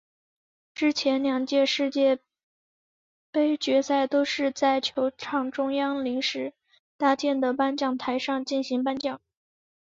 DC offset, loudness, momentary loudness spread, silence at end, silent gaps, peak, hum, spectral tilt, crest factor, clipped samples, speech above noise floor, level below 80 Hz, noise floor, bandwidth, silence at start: under 0.1%; -26 LUFS; 7 LU; 0.75 s; 2.43-3.33 s, 6.79-6.99 s; -10 dBFS; none; -3 dB/octave; 18 dB; under 0.1%; over 65 dB; -72 dBFS; under -90 dBFS; 7.6 kHz; 0.75 s